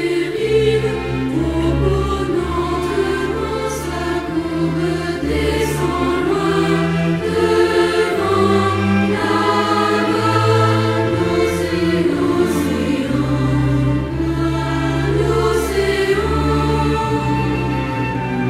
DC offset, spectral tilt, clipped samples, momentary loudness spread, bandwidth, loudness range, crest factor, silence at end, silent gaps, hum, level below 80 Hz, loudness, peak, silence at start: under 0.1%; -6.5 dB/octave; under 0.1%; 5 LU; 15.5 kHz; 4 LU; 14 dB; 0 s; none; none; -30 dBFS; -17 LUFS; -2 dBFS; 0 s